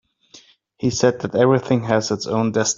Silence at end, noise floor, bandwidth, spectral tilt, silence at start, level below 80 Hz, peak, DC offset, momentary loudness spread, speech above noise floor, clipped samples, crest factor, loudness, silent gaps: 0.05 s; -50 dBFS; 7.8 kHz; -5 dB/octave; 0.35 s; -54 dBFS; -2 dBFS; under 0.1%; 6 LU; 31 dB; under 0.1%; 18 dB; -19 LUFS; none